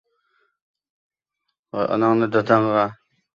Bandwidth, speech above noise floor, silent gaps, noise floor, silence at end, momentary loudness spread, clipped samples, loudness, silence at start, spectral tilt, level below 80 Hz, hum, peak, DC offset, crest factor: 7 kHz; 60 dB; none; -79 dBFS; 0.4 s; 9 LU; under 0.1%; -20 LUFS; 1.75 s; -8 dB/octave; -64 dBFS; none; -2 dBFS; under 0.1%; 20 dB